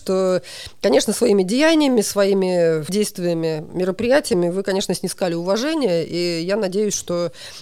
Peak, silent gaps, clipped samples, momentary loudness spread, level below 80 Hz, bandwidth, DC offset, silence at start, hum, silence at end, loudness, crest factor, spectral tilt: -4 dBFS; none; under 0.1%; 7 LU; -54 dBFS; 16.5 kHz; under 0.1%; 0 s; none; 0 s; -19 LUFS; 14 dB; -4.5 dB/octave